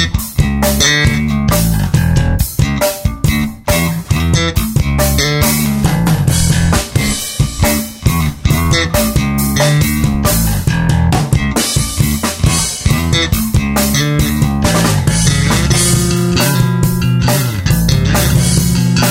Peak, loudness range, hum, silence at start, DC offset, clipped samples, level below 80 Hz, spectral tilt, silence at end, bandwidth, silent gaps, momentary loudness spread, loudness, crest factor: 0 dBFS; 2 LU; none; 0 s; under 0.1%; under 0.1%; -22 dBFS; -4.5 dB/octave; 0 s; 16.5 kHz; none; 4 LU; -13 LUFS; 12 dB